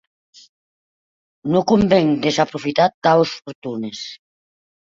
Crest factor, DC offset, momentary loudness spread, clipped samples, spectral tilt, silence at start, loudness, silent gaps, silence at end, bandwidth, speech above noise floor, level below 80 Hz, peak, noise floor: 18 dB; under 0.1%; 16 LU; under 0.1%; -6 dB/octave; 1.45 s; -18 LUFS; 2.94-3.02 s, 3.55-3.62 s; 0.7 s; 7.8 kHz; over 73 dB; -52 dBFS; -2 dBFS; under -90 dBFS